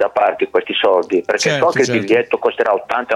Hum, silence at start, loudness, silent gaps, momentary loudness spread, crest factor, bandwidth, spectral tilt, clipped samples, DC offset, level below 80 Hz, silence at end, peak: none; 0 s; -16 LUFS; none; 4 LU; 12 dB; 12.5 kHz; -4 dB/octave; under 0.1%; under 0.1%; -60 dBFS; 0 s; -4 dBFS